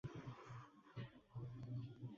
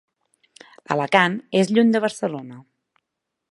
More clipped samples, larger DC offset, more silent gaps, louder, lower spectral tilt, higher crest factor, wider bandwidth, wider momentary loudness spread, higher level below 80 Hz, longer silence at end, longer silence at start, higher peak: neither; neither; neither; second, -54 LUFS vs -20 LUFS; first, -7 dB/octave vs -5.5 dB/octave; second, 14 dB vs 22 dB; second, 7.2 kHz vs 11.5 kHz; second, 7 LU vs 12 LU; about the same, -74 dBFS vs -72 dBFS; second, 0 s vs 0.9 s; second, 0.05 s vs 0.9 s; second, -38 dBFS vs 0 dBFS